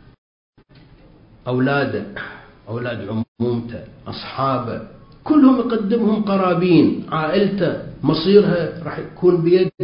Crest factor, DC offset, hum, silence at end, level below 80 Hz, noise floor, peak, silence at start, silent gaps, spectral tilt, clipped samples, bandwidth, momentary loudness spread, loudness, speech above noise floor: 18 dB; under 0.1%; none; 0 s; -50 dBFS; -48 dBFS; 0 dBFS; 1.45 s; 3.28-3.36 s; -12 dB/octave; under 0.1%; 5.4 kHz; 17 LU; -18 LUFS; 30 dB